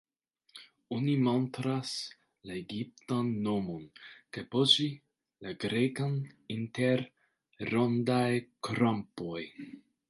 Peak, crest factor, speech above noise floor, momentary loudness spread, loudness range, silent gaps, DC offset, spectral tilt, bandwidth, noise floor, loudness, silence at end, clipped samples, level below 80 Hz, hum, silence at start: -10 dBFS; 24 dB; 41 dB; 19 LU; 3 LU; none; under 0.1%; -5.5 dB/octave; 11.5 kHz; -73 dBFS; -32 LUFS; 0.3 s; under 0.1%; -70 dBFS; none; 0.55 s